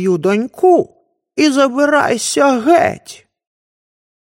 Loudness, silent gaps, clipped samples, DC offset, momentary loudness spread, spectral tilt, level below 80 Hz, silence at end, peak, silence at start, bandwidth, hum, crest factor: -13 LUFS; none; under 0.1%; under 0.1%; 8 LU; -4 dB/octave; -60 dBFS; 1.2 s; 0 dBFS; 0 s; 16.5 kHz; none; 14 dB